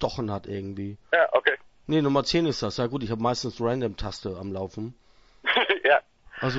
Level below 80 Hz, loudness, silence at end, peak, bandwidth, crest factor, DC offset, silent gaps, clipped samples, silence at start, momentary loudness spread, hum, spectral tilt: -50 dBFS; -26 LUFS; 0 s; -4 dBFS; 8 kHz; 22 dB; under 0.1%; none; under 0.1%; 0 s; 13 LU; none; -5 dB/octave